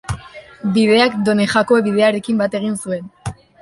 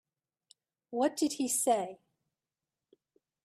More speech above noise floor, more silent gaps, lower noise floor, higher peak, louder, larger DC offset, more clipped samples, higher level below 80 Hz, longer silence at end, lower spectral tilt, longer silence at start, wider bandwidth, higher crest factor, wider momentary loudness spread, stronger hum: second, 21 dB vs over 59 dB; neither; second, -37 dBFS vs under -90 dBFS; first, -2 dBFS vs -18 dBFS; first, -16 LUFS vs -31 LUFS; neither; neither; first, -44 dBFS vs -82 dBFS; second, 0.3 s vs 1.5 s; first, -5.5 dB/octave vs -2.5 dB/octave; second, 0.1 s vs 0.9 s; second, 11.5 kHz vs 15 kHz; about the same, 16 dB vs 18 dB; first, 16 LU vs 11 LU; neither